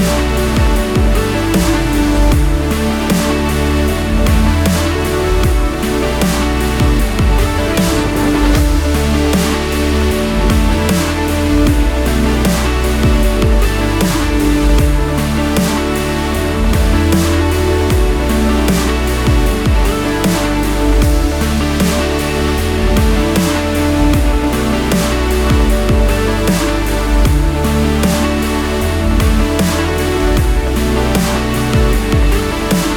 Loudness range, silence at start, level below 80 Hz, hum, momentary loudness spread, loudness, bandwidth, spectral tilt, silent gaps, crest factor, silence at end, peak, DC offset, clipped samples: 1 LU; 0 s; -16 dBFS; none; 3 LU; -14 LUFS; 19 kHz; -5.5 dB/octave; none; 12 dB; 0 s; 0 dBFS; under 0.1%; under 0.1%